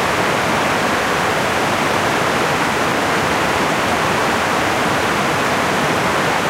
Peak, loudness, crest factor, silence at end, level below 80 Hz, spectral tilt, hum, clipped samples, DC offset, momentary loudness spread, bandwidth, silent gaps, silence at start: -2 dBFS; -16 LUFS; 14 dB; 0 s; -42 dBFS; -3.5 dB/octave; none; under 0.1%; under 0.1%; 0 LU; 16 kHz; none; 0 s